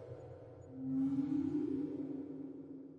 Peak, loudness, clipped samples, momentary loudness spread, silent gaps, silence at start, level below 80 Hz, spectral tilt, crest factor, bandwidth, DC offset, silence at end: -26 dBFS; -39 LUFS; under 0.1%; 16 LU; none; 0 s; -76 dBFS; -10 dB/octave; 14 dB; 4.4 kHz; under 0.1%; 0 s